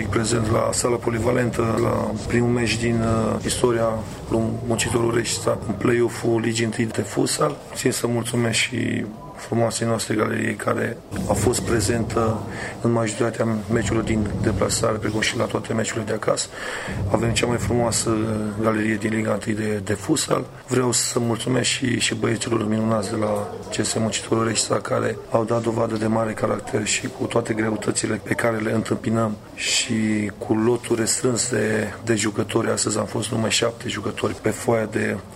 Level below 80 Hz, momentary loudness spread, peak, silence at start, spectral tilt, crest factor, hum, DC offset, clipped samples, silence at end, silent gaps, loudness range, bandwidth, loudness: -44 dBFS; 5 LU; -2 dBFS; 0 s; -4.5 dB/octave; 20 dB; none; under 0.1%; under 0.1%; 0 s; none; 1 LU; 16 kHz; -22 LUFS